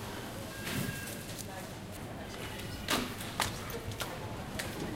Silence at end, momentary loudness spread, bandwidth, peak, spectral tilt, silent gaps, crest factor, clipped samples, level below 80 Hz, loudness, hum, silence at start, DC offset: 0 s; 10 LU; 17 kHz; -14 dBFS; -3.5 dB/octave; none; 24 dB; under 0.1%; -52 dBFS; -38 LUFS; none; 0 s; under 0.1%